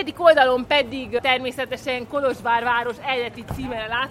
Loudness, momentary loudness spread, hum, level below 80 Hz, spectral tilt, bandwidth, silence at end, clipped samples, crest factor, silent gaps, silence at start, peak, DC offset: -21 LUFS; 12 LU; none; -48 dBFS; -4.5 dB/octave; 15.5 kHz; 0 s; under 0.1%; 20 dB; none; 0 s; -2 dBFS; under 0.1%